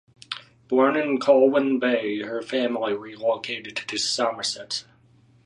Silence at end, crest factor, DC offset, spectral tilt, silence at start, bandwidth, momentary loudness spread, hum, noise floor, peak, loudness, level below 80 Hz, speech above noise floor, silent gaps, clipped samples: 0.65 s; 20 dB; under 0.1%; -3 dB/octave; 0.3 s; 11.5 kHz; 13 LU; none; -57 dBFS; -4 dBFS; -23 LUFS; -72 dBFS; 34 dB; none; under 0.1%